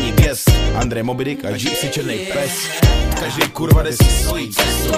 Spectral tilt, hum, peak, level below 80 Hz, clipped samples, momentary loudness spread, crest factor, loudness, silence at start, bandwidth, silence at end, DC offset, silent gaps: -4.5 dB/octave; none; -2 dBFS; -20 dBFS; under 0.1%; 7 LU; 14 dB; -17 LUFS; 0 s; 15.5 kHz; 0 s; under 0.1%; none